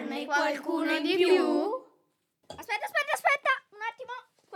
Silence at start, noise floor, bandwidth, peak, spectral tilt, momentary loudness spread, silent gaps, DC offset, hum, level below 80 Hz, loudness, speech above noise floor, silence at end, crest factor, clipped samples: 0 s; -73 dBFS; 16.5 kHz; -12 dBFS; -2.5 dB/octave; 18 LU; none; under 0.1%; none; -80 dBFS; -28 LUFS; 46 dB; 0 s; 18 dB; under 0.1%